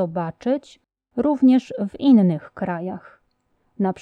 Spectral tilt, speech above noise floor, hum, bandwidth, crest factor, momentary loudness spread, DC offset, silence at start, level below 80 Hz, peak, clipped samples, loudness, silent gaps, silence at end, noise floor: -8.5 dB/octave; 48 dB; none; 7.4 kHz; 16 dB; 14 LU; under 0.1%; 0 s; -62 dBFS; -6 dBFS; under 0.1%; -20 LUFS; none; 0.1 s; -67 dBFS